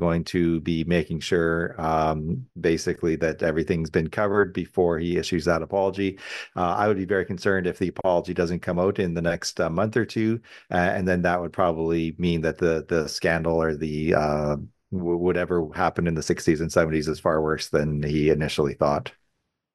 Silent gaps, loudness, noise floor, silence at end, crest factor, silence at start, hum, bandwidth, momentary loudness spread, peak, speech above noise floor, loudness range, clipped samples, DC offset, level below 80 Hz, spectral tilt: none; -24 LUFS; -76 dBFS; 0.65 s; 18 dB; 0 s; none; 12.5 kHz; 4 LU; -6 dBFS; 52 dB; 1 LU; under 0.1%; under 0.1%; -46 dBFS; -6 dB/octave